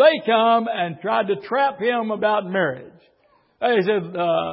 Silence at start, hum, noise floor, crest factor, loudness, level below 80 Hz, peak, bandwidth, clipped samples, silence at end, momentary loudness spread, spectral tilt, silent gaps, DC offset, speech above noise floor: 0 s; none; -60 dBFS; 18 dB; -21 LUFS; -68 dBFS; -4 dBFS; 5.8 kHz; under 0.1%; 0 s; 8 LU; -10 dB/octave; none; under 0.1%; 40 dB